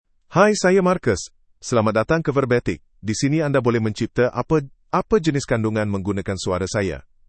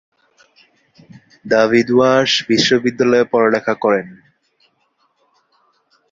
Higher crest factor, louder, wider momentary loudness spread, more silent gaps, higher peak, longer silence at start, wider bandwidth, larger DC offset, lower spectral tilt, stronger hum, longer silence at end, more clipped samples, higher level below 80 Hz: about the same, 20 dB vs 18 dB; second, -21 LUFS vs -14 LUFS; first, 8 LU vs 5 LU; neither; about the same, -2 dBFS vs 0 dBFS; second, 0.3 s vs 1.45 s; first, 8.8 kHz vs 7.8 kHz; neither; first, -6 dB/octave vs -4.5 dB/octave; neither; second, 0.25 s vs 2 s; neither; first, -46 dBFS vs -58 dBFS